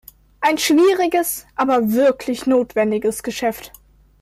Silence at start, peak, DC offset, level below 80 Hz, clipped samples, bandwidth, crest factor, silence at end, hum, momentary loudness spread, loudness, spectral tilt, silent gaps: 0.4 s; -6 dBFS; under 0.1%; -54 dBFS; under 0.1%; 16 kHz; 12 dB; 0.55 s; none; 9 LU; -18 LUFS; -3.5 dB/octave; none